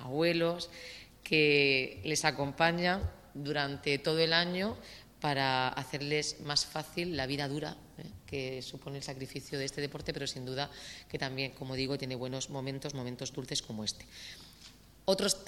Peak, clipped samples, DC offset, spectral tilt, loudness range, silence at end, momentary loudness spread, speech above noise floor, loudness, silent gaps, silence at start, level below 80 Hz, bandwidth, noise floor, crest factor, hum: -10 dBFS; under 0.1%; under 0.1%; -3.5 dB/octave; 9 LU; 0 s; 15 LU; 22 dB; -33 LUFS; none; 0 s; -58 dBFS; 16.5 kHz; -56 dBFS; 24 dB; none